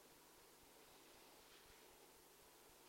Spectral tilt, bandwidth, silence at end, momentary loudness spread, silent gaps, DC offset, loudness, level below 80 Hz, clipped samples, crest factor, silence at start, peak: -2 dB/octave; 16 kHz; 0 s; 2 LU; none; under 0.1%; -65 LUFS; -82 dBFS; under 0.1%; 14 dB; 0 s; -54 dBFS